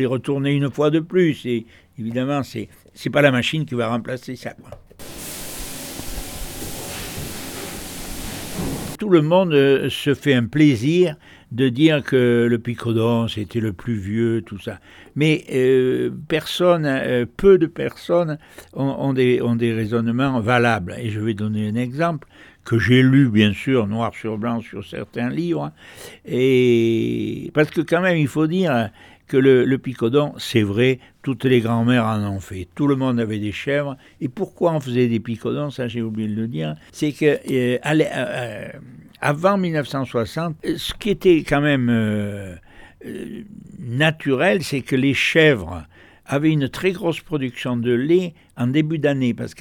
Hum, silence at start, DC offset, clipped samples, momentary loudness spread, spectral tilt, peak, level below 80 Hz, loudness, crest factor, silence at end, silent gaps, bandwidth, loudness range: none; 0 s; under 0.1%; under 0.1%; 15 LU; -6.5 dB/octave; -2 dBFS; -46 dBFS; -20 LUFS; 18 dB; 0.1 s; none; 19.5 kHz; 5 LU